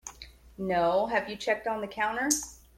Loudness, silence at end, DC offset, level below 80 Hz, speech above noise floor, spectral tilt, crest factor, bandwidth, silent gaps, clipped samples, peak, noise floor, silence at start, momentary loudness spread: -29 LUFS; 0.2 s; under 0.1%; -56 dBFS; 21 dB; -3 dB/octave; 22 dB; 16.5 kHz; none; under 0.1%; -10 dBFS; -50 dBFS; 0.05 s; 16 LU